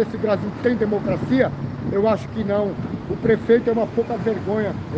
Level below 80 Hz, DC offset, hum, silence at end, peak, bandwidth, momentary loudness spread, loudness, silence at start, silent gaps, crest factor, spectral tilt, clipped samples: -46 dBFS; under 0.1%; none; 0 s; -4 dBFS; 7.6 kHz; 6 LU; -21 LUFS; 0 s; none; 16 dB; -8.5 dB/octave; under 0.1%